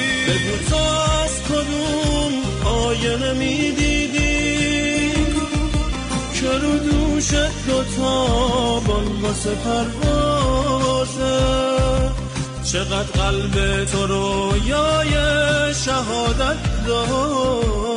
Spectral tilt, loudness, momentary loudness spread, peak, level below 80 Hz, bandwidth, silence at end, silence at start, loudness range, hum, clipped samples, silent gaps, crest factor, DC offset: -4.5 dB/octave; -19 LUFS; 4 LU; -8 dBFS; -26 dBFS; 11 kHz; 0 s; 0 s; 1 LU; none; under 0.1%; none; 10 dB; under 0.1%